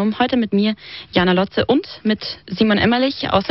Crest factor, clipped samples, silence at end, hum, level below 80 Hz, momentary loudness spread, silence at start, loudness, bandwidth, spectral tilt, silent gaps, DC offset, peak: 16 dB; under 0.1%; 0 s; none; -46 dBFS; 6 LU; 0 s; -18 LUFS; 6 kHz; -4 dB/octave; none; 0.1%; -2 dBFS